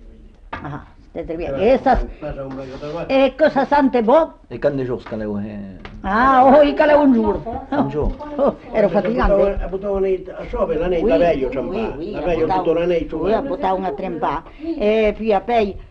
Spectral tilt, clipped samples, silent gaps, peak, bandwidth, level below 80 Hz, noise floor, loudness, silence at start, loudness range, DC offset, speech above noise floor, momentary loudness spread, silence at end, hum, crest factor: -8 dB/octave; under 0.1%; none; -4 dBFS; 7 kHz; -34 dBFS; -41 dBFS; -18 LUFS; 0 s; 4 LU; under 0.1%; 24 dB; 16 LU; 0.05 s; none; 14 dB